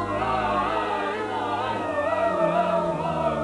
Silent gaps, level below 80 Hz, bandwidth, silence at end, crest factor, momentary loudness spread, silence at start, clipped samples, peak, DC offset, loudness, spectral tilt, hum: none; -50 dBFS; 11.5 kHz; 0 s; 14 dB; 4 LU; 0 s; under 0.1%; -10 dBFS; under 0.1%; -25 LUFS; -6 dB/octave; none